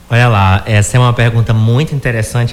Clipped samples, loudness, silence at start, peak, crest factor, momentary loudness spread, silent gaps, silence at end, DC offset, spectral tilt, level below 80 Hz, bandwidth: under 0.1%; -11 LUFS; 0.1 s; -2 dBFS; 8 dB; 6 LU; none; 0 s; under 0.1%; -6 dB/octave; -32 dBFS; 13 kHz